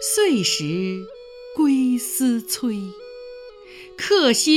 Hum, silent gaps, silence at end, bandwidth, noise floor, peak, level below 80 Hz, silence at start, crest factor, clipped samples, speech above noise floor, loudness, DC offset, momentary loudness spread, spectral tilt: none; none; 0 s; 17.5 kHz; -42 dBFS; -4 dBFS; -60 dBFS; 0 s; 16 dB; under 0.1%; 22 dB; -20 LUFS; under 0.1%; 22 LU; -3 dB/octave